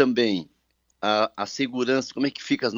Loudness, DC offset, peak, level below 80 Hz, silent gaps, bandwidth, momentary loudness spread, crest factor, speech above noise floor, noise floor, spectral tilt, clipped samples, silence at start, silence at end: -25 LUFS; under 0.1%; -4 dBFS; -70 dBFS; none; 7.6 kHz; 5 LU; 20 dB; 46 dB; -70 dBFS; -4.5 dB/octave; under 0.1%; 0 s; 0 s